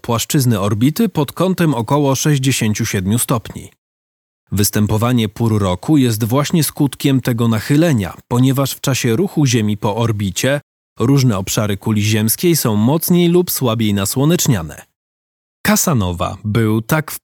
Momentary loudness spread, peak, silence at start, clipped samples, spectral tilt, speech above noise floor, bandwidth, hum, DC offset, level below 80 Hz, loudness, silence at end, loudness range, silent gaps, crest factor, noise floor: 5 LU; 0 dBFS; 0.05 s; under 0.1%; -5 dB/octave; over 75 dB; over 20 kHz; none; under 0.1%; -46 dBFS; -15 LUFS; 0.05 s; 3 LU; 3.78-4.47 s, 10.63-10.96 s, 14.96-15.64 s; 16 dB; under -90 dBFS